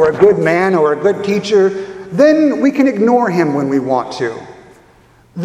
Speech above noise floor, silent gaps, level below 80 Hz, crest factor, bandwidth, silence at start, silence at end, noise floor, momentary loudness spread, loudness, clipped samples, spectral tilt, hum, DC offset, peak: 35 dB; none; -52 dBFS; 14 dB; 11 kHz; 0 s; 0 s; -47 dBFS; 12 LU; -13 LUFS; under 0.1%; -6.5 dB/octave; none; under 0.1%; 0 dBFS